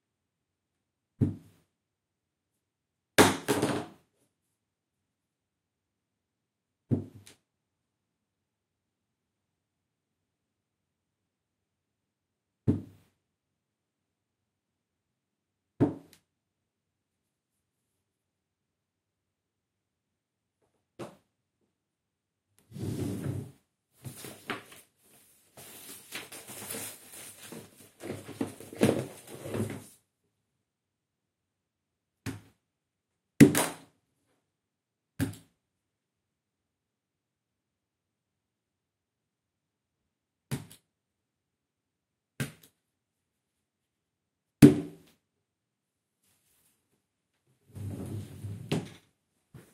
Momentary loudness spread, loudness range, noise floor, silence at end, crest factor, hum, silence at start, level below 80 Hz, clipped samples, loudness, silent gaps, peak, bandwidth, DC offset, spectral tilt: 26 LU; 19 LU; -86 dBFS; 0.15 s; 32 dB; none; 1.2 s; -64 dBFS; under 0.1%; -29 LUFS; none; -2 dBFS; 16.5 kHz; under 0.1%; -5.5 dB/octave